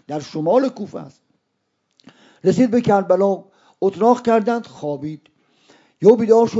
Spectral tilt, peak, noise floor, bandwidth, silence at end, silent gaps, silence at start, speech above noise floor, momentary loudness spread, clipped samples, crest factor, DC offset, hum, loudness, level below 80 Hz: -7.5 dB/octave; 0 dBFS; -72 dBFS; 7.8 kHz; 0 s; none; 0.1 s; 55 dB; 16 LU; under 0.1%; 18 dB; under 0.1%; none; -18 LUFS; -62 dBFS